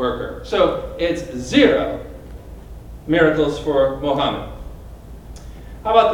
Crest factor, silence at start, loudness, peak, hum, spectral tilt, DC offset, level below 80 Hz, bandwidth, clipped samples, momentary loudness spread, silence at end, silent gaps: 20 dB; 0 s; -19 LUFS; 0 dBFS; none; -5.5 dB/octave; under 0.1%; -36 dBFS; 17.5 kHz; under 0.1%; 24 LU; 0 s; none